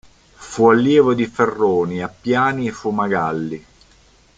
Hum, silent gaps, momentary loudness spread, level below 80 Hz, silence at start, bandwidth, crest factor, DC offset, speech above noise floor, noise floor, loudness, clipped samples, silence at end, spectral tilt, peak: none; none; 12 LU; -54 dBFS; 0.4 s; 9.2 kHz; 16 dB; under 0.1%; 35 dB; -52 dBFS; -17 LUFS; under 0.1%; 0.8 s; -6.5 dB/octave; -2 dBFS